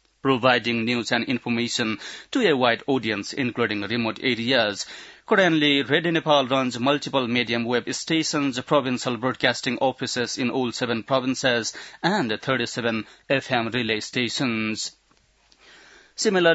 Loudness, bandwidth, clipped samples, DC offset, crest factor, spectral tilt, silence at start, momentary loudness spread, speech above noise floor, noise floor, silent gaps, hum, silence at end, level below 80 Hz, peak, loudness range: -23 LUFS; 8 kHz; under 0.1%; under 0.1%; 20 dB; -4 dB/octave; 0.25 s; 7 LU; 38 dB; -62 dBFS; none; none; 0 s; -66 dBFS; -4 dBFS; 4 LU